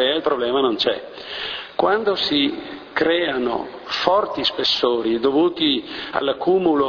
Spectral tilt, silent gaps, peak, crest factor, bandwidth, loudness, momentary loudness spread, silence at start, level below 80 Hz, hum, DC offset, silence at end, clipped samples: -5 dB/octave; none; 0 dBFS; 20 dB; 5.4 kHz; -20 LUFS; 9 LU; 0 s; -56 dBFS; none; under 0.1%; 0 s; under 0.1%